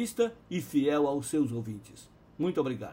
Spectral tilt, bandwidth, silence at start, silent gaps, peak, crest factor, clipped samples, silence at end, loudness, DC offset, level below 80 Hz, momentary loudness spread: -6 dB/octave; 16 kHz; 0 s; none; -16 dBFS; 16 dB; under 0.1%; 0 s; -30 LUFS; under 0.1%; -64 dBFS; 10 LU